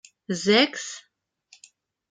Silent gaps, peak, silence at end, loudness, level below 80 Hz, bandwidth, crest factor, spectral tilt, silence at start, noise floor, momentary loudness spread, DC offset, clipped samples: none; -4 dBFS; 1.1 s; -22 LUFS; -74 dBFS; 9.6 kHz; 22 dB; -3.5 dB/octave; 0.3 s; -59 dBFS; 17 LU; under 0.1%; under 0.1%